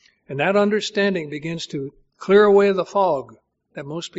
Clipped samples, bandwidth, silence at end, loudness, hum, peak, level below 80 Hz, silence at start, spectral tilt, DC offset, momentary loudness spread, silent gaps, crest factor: under 0.1%; 8 kHz; 0 s; -19 LUFS; none; -4 dBFS; -62 dBFS; 0.3 s; -4 dB/octave; under 0.1%; 19 LU; none; 18 dB